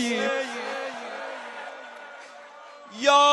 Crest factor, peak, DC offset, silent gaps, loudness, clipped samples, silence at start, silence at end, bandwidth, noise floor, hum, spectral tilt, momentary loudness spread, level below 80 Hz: 20 dB; -6 dBFS; under 0.1%; none; -27 LUFS; under 0.1%; 0 s; 0 s; 11.5 kHz; -45 dBFS; none; -1.5 dB/octave; 22 LU; -90 dBFS